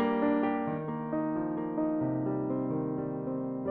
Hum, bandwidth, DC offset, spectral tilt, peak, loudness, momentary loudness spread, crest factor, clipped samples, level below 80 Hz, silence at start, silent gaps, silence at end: none; 4.1 kHz; under 0.1%; -7.5 dB/octave; -18 dBFS; -32 LUFS; 6 LU; 14 dB; under 0.1%; -64 dBFS; 0 s; none; 0 s